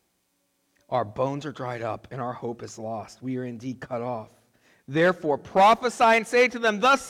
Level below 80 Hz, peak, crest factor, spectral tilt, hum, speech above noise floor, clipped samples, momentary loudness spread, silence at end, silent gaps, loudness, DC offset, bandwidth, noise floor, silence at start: -64 dBFS; -12 dBFS; 14 dB; -4.5 dB/octave; none; 48 dB; under 0.1%; 16 LU; 0 s; none; -25 LUFS; under 0.1%; 16 kHz; -72 dBFS; 0.9 s